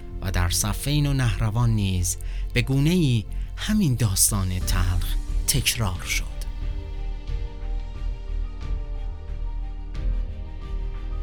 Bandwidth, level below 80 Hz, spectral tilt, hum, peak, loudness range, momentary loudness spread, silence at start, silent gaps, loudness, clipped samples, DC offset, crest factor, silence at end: over 20 kHz; -28 dBFS; -4 dB/octave; none; -4 dBFS; 11 LU; 14 LU; 0 s; none; -25 LUFS; under 0.1%; 0.8%; 20 dB; 0 s